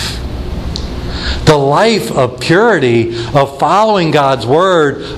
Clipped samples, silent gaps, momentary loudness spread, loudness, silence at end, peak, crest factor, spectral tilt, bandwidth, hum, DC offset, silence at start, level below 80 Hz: under 0.1%; none; 12 LU; -11 LUFS; 0 s; 0 dBFS; 12 dB; -5.5 dB/octave; 14.5 kHz; none; 0.1%; 0 s; -26 dBFS